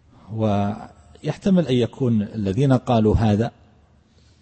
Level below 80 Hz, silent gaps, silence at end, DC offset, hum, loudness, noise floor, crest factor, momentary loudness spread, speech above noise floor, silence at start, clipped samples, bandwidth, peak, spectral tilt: -40 dBFS; none; 0.9 s; under 0.1%; none; -21 LUFS; -55 dBFS; 16 dB; 11 LU; 35 dB; 0.3 s; under 0.1%; 8.8 kHz; -6 dBFS; -8.5 dB/octave